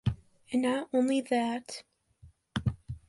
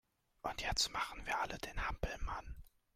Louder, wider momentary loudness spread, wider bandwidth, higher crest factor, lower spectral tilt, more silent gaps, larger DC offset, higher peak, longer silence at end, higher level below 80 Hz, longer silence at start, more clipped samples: first, -31 LUFS vs -40 LUFS; first, 15 LU vs 12 LU; second, 11.5 kHz vs 16 kHz; about the same, 18 dB vs 22 dB; first, -6.5 dB/octave vs -2 dB/octave; neither; neither; first, -14 dBFS vs -20 dBFS; second, 0.1 s vs 0.25 s; about the same, -50 dBFS vs -48 dBFS; second, 0.05 s vs 0.45 s; neither